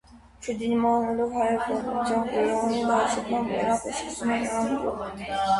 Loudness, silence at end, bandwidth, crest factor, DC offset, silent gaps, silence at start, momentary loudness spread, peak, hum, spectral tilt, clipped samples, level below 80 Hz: -26 LUFS; 0 s; 11.5 kHz; 14 dB; under 0.1%; none; 0.15 s; 8 LU; -12 dBFS; none; -4.5 dB/octave; under 0.1%; -52 dBFS